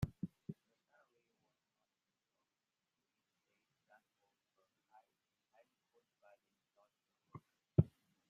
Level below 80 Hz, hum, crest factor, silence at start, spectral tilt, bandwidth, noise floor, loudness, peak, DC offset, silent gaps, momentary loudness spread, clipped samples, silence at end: -68 dBFS; none; 32 dB; 0 s; -10 dB/octave; 7 kHz; under -90 dBFS; -40 LUFS; -16 dBFS; under 0.1%; none; 24 LU; under 0.1%; 0.45 s